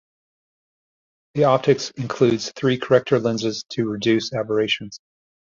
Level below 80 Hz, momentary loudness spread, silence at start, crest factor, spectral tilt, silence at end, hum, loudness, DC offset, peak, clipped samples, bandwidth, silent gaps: -60 dBFS; 8 LU; 1.35 s; 20 dB; -5.5 dB/octave; 0.6 s; none; -21 LUFS; under 0.1%; -2 dBFS; under 0.1%; 7.6 kHz; none